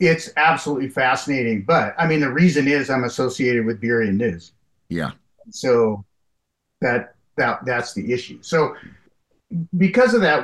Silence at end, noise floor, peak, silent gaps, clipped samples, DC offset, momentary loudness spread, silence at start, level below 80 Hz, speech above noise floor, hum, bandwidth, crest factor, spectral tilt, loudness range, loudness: 0 s; -75 dBFS; -4 dBFS; none; under 0.1%; under 0.1%; 12 LU; 0 s; -56 dBFS; 56 dB; none; 12.5 kHz; 16 dB; -6 dB/octave; 5 LU; -20 LUFS